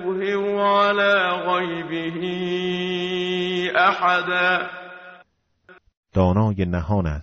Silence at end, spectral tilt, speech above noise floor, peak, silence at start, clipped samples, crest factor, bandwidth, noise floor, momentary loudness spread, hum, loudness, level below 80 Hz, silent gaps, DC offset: 0 s; -3.5 dB/octave; 37 dB; -4 dBFS; 0 s; under 0.1%; 16 dB; 7.6 kHz; -57 dBFS; 9 LU; none; -21 LUFS; -44 dBFS; 5.97-6.03 s; under 0.1%